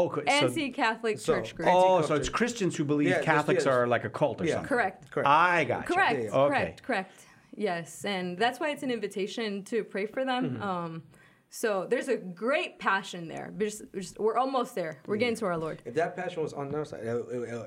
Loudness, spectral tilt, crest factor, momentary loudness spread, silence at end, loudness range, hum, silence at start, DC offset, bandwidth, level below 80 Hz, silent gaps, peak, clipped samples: -29 LUFS; -5 dB/octave; 22 dB; 10 LU; 0 s; 6 LU; none; 0 s; under 0.1%; 16.5 kHz; -60 dBFS; none; -8 dBFS; under 0.1%